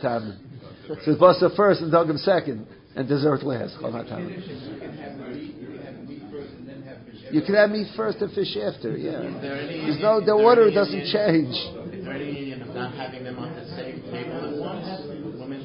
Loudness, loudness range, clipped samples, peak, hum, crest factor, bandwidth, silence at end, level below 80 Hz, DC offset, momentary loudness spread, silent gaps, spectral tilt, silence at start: -23 LUFS; 12 LU; under 0.1%; -2 dBFS; none; 22 dB; 5.4 kHz; 0 s; -60 dBFS; under 0.1%; 21 LU; none; -10.5 dB/octave; 0 s